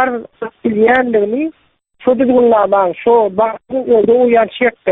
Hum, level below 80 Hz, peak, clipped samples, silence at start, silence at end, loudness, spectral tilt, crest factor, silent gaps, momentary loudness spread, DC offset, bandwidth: none; -52 dBFS; 0 dBFS; under 0.1%; 0 s; 0 s; -13 LUFS; -9 dB/octave; 12 dB; none; 10 LU; under 0.1%; 3.9 kHz